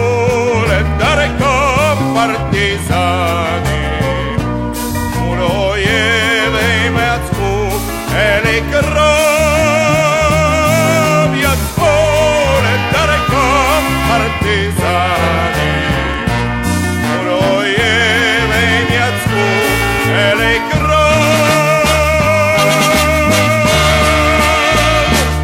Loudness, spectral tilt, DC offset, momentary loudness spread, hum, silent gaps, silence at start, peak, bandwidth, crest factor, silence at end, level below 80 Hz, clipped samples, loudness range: -12 LUFS; -4.5 dB/octave; under 0.1%; 6 LU; none; none; 0 s; 0 dBFS; 16.5 kHz; 12 dB; 0 s; -24 dBFS; under 0.1%; 4 LU